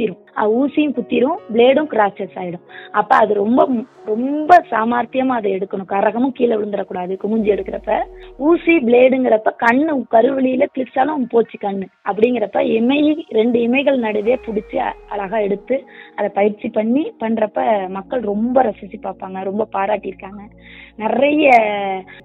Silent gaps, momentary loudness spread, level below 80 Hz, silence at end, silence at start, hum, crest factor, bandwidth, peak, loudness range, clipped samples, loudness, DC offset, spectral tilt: none; 11 LU; -52 dBFS; 0.05 s; 0 s; none; 16 dB; 7.2 kHz; 0 dBFS; 5 LU; under 0.1%; -17 LUFS; under 0.1%; -7.5 dB/octave